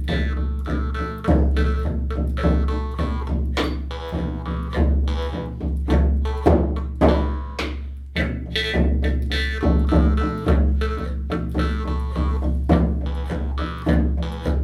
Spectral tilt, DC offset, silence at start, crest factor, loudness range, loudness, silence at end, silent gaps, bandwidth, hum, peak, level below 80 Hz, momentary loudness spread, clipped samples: -7.5 dB/octave; under 0.1%; 0 s; 18 dB; 3 LU; -22 LUFS; 0 s; none; 6.8 kHz; none; -2 dBFS; -22 dBFS; 8 LU; under 0.1%